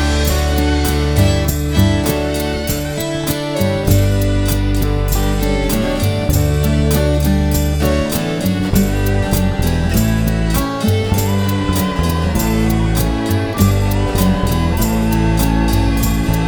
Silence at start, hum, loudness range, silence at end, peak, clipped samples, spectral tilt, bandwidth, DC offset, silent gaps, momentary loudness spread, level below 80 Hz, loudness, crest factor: 0 s; none; 1 LU; 0 s; 0 dBFS; under 0.1%; -5.5 dB/octave; over 20 kHz; under 0.1%; none; 3 LU; -20 dBFS; -16 LUFS; 14 dB